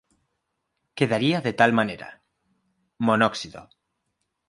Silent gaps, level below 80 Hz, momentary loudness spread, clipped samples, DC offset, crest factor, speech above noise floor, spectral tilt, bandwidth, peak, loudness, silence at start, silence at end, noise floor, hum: none; -64 dBFS; 19 LU; under 0.1%; under 0.1%; 24 dB; 55 dB; -5.5 dB/octave; 11.5 kHz; -2 dBFS; -22 LUFS; 0.95 s; 0.85 s; -78 dBFS; none